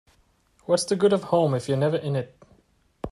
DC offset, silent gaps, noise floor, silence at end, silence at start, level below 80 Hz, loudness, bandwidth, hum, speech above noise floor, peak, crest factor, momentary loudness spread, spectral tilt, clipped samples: under 0.1%; none; -63 dBFS; 0 s; 0.7 s; -56 dBFS; -24 LUFS; 12 kHz; none; 40 dB; -8 dBFS; 18 dB; 18 LU; -6 dB/octave; under 0.1%